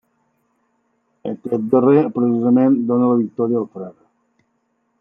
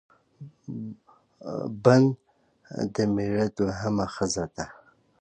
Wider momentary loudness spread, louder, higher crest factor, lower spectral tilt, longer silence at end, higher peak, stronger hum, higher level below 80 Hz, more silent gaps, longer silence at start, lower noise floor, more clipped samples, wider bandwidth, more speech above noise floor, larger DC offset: second, 16 LU vs 20 LU; first, -17 LUFS vs -26 LUFS; about the same, 18 dB vs 22 dB; first, -11.5 dB/octave vs -6.5 dB/octave; first, 1.1 s vs 0.5 s; about the same, -2 dBFS vs -4 dBFS; neither; second, -68 dBFS vs -54 dBFS; neither; first, 1.25 s vs 0.4 s; first, -68 dBFS vs -62 dBFS; neither; second, 3.7 kHz vs 9.8 kHz; first, 51 dB vs 36 dB; neither